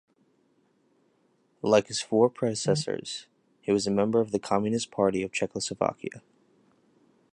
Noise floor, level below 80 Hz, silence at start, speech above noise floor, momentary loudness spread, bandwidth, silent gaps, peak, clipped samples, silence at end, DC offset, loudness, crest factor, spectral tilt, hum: -68 dBFS; -64 dBFS; 1.65 s; 42 dB; 11 LU; 11 kHz; none; -8 dBFS; under 0.1%; 1.15 s; under 0.1%; -27 LUFS; 20 dB; -5 dB/octave; none